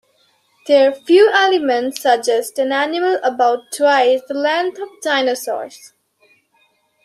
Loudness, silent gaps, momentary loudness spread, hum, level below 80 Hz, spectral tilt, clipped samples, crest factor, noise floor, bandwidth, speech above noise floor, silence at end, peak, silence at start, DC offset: -16 LUFS; none; 12 LU; none; -72 dBFS; -1.5 dB/octave; under 0.1%; 16 dB; -60 dBFS; 15 kHz; 45 dB; 1.2 s; -2 dBFS; 0.65 s; under 0.1%